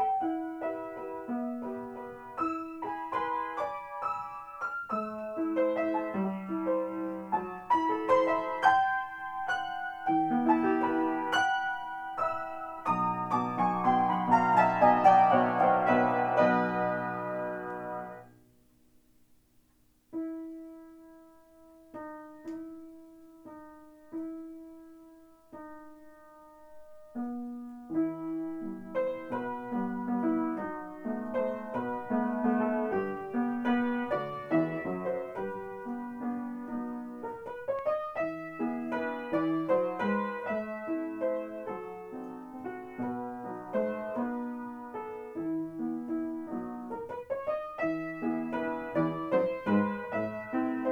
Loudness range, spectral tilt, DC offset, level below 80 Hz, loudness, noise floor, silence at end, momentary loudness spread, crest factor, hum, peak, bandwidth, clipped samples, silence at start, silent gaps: 20 LU; -7 dB/octave; under 0.1%; -68 dBFS; -31 LUFS; -67 dBFS; 0 s; 16 LU; 24 dB; none; -8 dBFS; 19 kHz; under 0.1%; 0 s; none